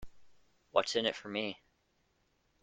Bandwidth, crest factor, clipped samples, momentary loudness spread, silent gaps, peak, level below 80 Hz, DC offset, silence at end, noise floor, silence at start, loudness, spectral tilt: 9.6 kHz; 28 dB; under 0.1%; 10 LU; none; -12 dBFS; -66 dBFS; under 0.1%; 1.05 s; -76 dBFS; 0 s; -35 LUFS; -3 dB/octave